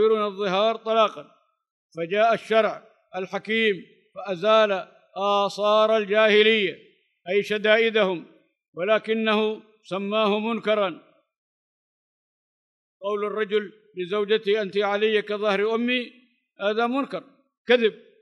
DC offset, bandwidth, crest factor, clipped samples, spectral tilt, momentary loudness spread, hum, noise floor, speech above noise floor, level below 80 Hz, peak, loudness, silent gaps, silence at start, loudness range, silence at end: under 0.1%; 10 kHz; 20 dB; under 0.1%; -5 dB/octave; 15 LU; none; under -90 dBFS; over 67 dB; -84 dBFS; -4 dBFS; -23 LUFS; 1.70-1.90 s, 8.68-8.73 s, 11.38-13.00 s, 17.57-17.65 s; 0 s; 7 LU; 0.25 s